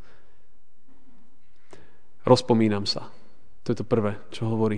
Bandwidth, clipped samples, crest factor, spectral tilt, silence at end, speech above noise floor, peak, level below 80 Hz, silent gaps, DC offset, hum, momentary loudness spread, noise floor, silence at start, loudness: 10 kHz; under 0.1%; 24 dB; -6.5 dB/octave; 0 s; 42 dB; -4 dBFS; -60 dBFS; none; 2%; none; 13 LU; -65 dBFS; 2.25 s; -25 LUFS